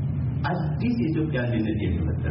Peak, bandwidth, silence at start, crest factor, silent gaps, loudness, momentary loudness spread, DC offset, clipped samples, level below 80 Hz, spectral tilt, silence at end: -14 dBFS; 5.8 kHz; 0 s; 10 dB; none; -26 LUFS; 2 LU; under 0.1%; under 0.1%; -38 dBFS; -7.5 dB/octave; 0 s